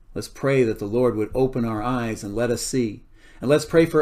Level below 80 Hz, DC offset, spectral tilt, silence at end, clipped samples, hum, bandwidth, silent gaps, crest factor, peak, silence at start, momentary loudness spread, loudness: -42 dBFS; under 0.1%; -6 dB/octave; 0 s; under 0.1%; none; 15.5 kHz; none; 18 dB; -4 dBFS; 0.1 s; 10 LU; -23 LUFS